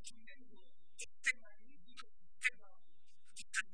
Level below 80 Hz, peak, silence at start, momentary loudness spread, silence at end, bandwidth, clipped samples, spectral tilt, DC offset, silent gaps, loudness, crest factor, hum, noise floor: -80 dBFS; -20 dBFS; 0.05 s; 23 LU; 0.1 s; 10.5 kHz; under 0.1%; 0.5 dB/octave; 0.6%; none; -41 LUFS; 26 dB; none; -73 dBFS